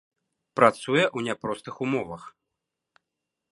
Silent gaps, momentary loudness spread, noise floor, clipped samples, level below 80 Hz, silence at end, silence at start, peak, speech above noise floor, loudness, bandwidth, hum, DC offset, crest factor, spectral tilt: none; 15 LU; -85 dBFS; under 0.1%; -66 dBFS; 1.2 s; 0.55 s; -2 dBFS; 60 dB; -25 LUFS; 11.5 kHz; none; under 0.1%; 26 dB; -5 dB/octave